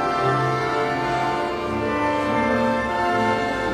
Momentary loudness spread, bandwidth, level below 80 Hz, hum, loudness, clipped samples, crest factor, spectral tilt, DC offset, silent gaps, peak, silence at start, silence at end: 3 LU; 15 kHz; -44 dBFS; none; -22 LUFS; under 0.1%; 12 dB; -6 dB/octave; under 0.1%; none; -8 dBFS; 0 s; 0 s